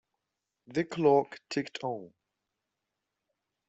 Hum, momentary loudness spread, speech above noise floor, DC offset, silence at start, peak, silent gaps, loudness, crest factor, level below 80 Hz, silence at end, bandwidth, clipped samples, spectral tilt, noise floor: none; 12 LU; 57 dB; under 0.1%; 0.7 s; -12 dBFS; none; -30 LUFS; 22 dB; -76 dBFS; 1.6 s; 8.2 kHz; under 0.1%; -6 dB/octave; -86 dBFS